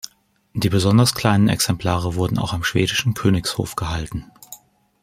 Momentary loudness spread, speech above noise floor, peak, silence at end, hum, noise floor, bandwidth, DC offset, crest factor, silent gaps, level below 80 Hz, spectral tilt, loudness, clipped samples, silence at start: 17 LU; 37 dB; -2 dBFS; 0.45 s; none; -56 dBFS; 16 kHz; under 0.1%; 18 dB; none; -42 dBFS; -5 dB/octave; -19 LUFS; under 0.1%; 0.05 s